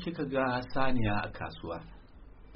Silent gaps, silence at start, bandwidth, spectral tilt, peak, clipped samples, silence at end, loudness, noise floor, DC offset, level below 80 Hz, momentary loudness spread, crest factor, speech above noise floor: none; 0 s; 5.8 kHz; -5 dB/octave; -16 dBFS; under 0.1%; 0 s; -33 LUFS; -51 dBFS; under 0.1%; -46 dBFS; 12 LU; 16 dB; 21 dB